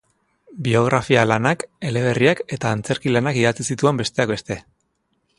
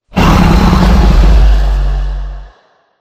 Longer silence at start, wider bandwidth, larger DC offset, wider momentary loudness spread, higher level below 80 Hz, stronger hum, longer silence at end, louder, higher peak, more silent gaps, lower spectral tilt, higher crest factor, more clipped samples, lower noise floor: first, 0.5 s vs 0.15 s; second, 11.5 kHz vs 14.5 kHz; neither; second, 8 LU vs 13 LU; second, -52 dBFS vs -10 dBFS; neither; first, 0.8 s vs 0.55 s; second, -20 LUFS vs -10 LUFS; about the same, 0 dBFS vs 0 dBFS; neither; about the same, -5.5 dB/octave vs -6.5 dB/octave; first, 20 dB vs 8 dB; second, under 0.1% vs 0.8%; first, -69 dBFS vs -48 dBFS